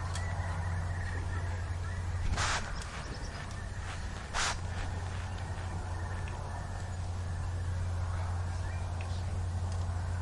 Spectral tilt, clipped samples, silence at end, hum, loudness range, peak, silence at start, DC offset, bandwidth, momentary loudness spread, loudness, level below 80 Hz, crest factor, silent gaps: -4.5 dB/octave; under 0.1%; 0 s; none; 2 LU; -18 dBFS; 0 s; under 0.1%; 11.5 kHz; 7 LU; -37 LUFS; -42 dBFS; 16 dB; none